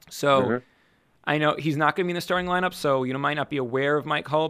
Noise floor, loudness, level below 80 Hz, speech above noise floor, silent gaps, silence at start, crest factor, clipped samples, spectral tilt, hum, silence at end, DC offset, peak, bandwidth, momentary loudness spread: -63 dBFS; -24 LUFS; -60 dBFS; 39 dB; none; 0.1 s; 18 dB; under 0.1%; -5.5 dB/octave; none; 0 s; under 0.1%; -6 dBFS; 15.5 kHz; 5 LU